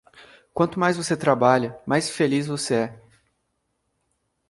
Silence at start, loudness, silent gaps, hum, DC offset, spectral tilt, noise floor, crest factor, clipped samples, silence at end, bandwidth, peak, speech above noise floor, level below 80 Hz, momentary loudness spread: 0.55 s; -22 LUFS; none; none; under 0.1%; -5 dB/octave; -74 dBFS; 22 dB; under 0.1%; 1.5 s; 11.5 kHz; -2 dBFS; 52 dB; -62 dBFS; 6 LU